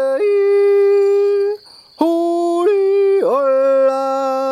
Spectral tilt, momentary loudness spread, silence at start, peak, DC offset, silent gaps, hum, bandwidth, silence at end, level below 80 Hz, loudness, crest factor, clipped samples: -4.5 dB/octave; 6 LU; 0 s; -2 dBFS; under 0.1%; none; none; 10.5 kHz; 0 s; -72 dBFS; -15 LUFS; 12 dB; under 0.1%